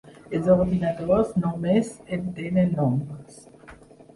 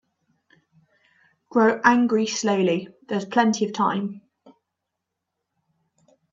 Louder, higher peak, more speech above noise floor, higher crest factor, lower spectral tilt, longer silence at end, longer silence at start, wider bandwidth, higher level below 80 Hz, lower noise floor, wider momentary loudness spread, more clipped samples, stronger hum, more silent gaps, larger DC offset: about the same, -24 LUFS vs -22 LUFS; second, -8 dBFS vs -4 dBFS; second, 25 dB vs 61 dB; about the same, 18 dB vs 20 dB; first, -8.5 dB/octave vs -4.5 dB/octave; second, 0.4 s vs 2.15 s; second, 0.05 s vs 1.55 s; first, 11.5 kHz vs 7.8 kHz; first, -48 dBFS vs -70 dBFS; second, -48 dBFS vs -82 dBFS; about the same, 11 LU vs 11 LU; neither; neither; neither; neither